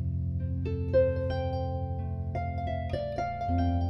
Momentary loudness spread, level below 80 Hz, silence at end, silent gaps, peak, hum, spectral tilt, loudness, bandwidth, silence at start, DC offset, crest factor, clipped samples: 8 LU; -40 dBFS; 0 s; none; -14 dBFS; none; -9.5 dB/octave; -31 LUFS; 6 kHz; 0 s; under 0.1%; 16 dB; under 0.1%